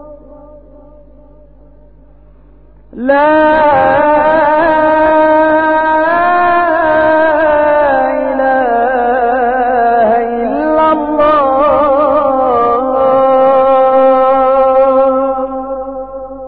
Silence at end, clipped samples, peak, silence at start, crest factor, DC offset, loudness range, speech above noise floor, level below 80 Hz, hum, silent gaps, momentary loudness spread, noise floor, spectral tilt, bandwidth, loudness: 0 s; under 0.1%; 0 dBFS; 0 s; 10 dB; under 0.1%; 3 LU; 33 dB; -40 dBFS; none; none; 5 LU; -41 dBFS; -10.5 dB/octave; 4.7 kHz; -10 LUFS